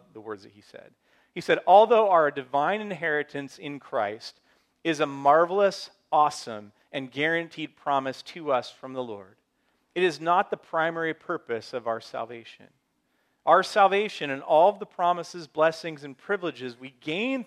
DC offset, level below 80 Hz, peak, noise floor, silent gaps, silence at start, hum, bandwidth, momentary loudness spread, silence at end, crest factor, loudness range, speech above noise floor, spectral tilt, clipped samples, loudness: under 0.1%; -80 dBFS; -4 dBFS; -72 dBFS; none; 0.15 s; none; 12 kHz; 18 LU; 0.05 s; 22 dB; 6 LU; 47 dB; -4.5 dB/octave; under 0.1%; -25 LUFS